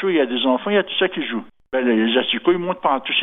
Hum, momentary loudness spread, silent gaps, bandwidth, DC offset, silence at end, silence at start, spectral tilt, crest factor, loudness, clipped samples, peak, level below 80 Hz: none; 8 LU; none; 3.9 kHz; under 0.1%; 0 s; 0 s; -8 dB/octave; 16 dB; -19 LUFS; under 0.1%; -4 dBFS; -62 dBFS